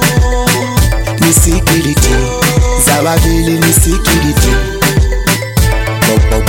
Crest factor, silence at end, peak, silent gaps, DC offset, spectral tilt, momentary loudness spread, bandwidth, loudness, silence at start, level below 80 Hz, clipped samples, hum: 10 dB; 0 s; 0 dBFS; none; under 0.1%; -4 dB/octave; 4 LU; 17.5 kHz; -10 LUFS; 0 s; -14 dBFS; under 0.1%; none